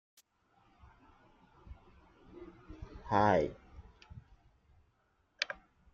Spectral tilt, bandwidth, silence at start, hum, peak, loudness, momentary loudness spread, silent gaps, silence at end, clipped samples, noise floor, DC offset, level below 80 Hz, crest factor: -4 dB/octave; 7.4 kHz; 1.7 s; none; -14 dBFS; -33 LUFS; 28 LU; none; 0.4 s; under 0.1%; -75 dBFS; under 0.1%; -60 dBFS; 26 dB